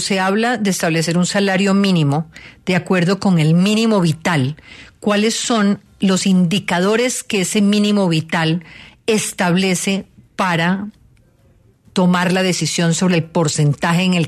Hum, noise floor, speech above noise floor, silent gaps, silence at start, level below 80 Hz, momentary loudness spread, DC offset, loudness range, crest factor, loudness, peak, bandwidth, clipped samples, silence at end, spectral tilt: none; -52 dBFS; 36 dB; none; 0 s; -54 dBFS; 7 LU; under 0.1%; 3 LU; 14 dB; -16 LUFS; -4 dBFS; 13.5 kHz; under 0.1%; 0 s; -5 dB/octave